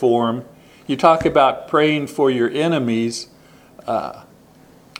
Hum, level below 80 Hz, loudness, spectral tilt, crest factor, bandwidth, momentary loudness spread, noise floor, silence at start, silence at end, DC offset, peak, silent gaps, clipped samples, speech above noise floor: none; -52 dBFS; -18 LUFS; -5.5 dB/octave; 20 dB; 15.5 kHz; 16 LU; -48 dBFS; 0 s; 0.8 s; under 0.1%; 0 dBFS; none; under 0.1%; 31 dB